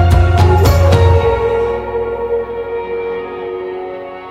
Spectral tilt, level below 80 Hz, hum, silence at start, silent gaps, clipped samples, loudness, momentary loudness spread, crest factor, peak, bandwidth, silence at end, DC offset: -7 dB/octave; -22 dBFS; none; 0 s; none; under 0.1%; -14 LUFS; 13 LU; 12 dB; 0 dBFS; 13 kHz; 0 s; under 0.1%